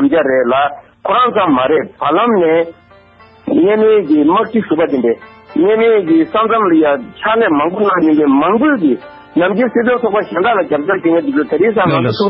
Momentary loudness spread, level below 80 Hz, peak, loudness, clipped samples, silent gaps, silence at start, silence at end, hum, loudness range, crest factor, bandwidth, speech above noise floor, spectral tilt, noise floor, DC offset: 5 LU; -52 dBFS; -2 dBFS; -12 LUFS; under 0.1%; none; 0 s; 0 s; none; 2 LU; 10 dB; 5.8 kHz; 31 dB; -10 dB/octave; -43 dBFS; under 0.1%